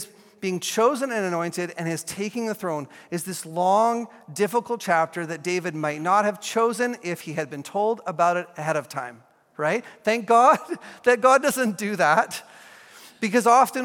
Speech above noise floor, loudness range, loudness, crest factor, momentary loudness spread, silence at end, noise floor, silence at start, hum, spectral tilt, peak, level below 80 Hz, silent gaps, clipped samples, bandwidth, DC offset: 25 dB; 5 LU; -23 LUFS; 20 dB; 13 LU; 0 s; -48 dBFS; 0 s; none; -4 dB/octave; -4 dBFS; -76 dBFS; none; under 0.1%; 17.5 kHz; under 0.1%